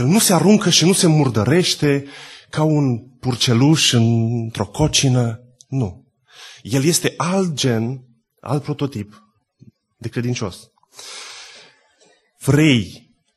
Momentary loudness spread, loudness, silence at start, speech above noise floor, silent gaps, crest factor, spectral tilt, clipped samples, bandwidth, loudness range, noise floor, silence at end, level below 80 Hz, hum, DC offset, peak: 21 LU; -17 LUFS; 0 s; 40 dB; none; 18 dB; -4.5 dB/octave; under 0.1%; 12.5 kHz; 11 LU; -57 dBFS; 0.4 s; -48 dBFS; none; under 0.1%; -2 dBFS